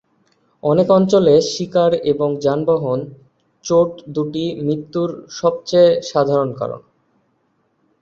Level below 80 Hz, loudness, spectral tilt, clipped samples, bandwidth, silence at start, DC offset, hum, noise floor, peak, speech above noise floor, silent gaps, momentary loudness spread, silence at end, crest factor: -58 dBFS; -17 LUFS; -6.5 dB/octave; under 0.1%; 7.8 kHz; 0.65 s; under 0.1%; none; -64 dBFS; -2 dBFS; 48 dB; none; 11 LU; 1.25 s; 16 dB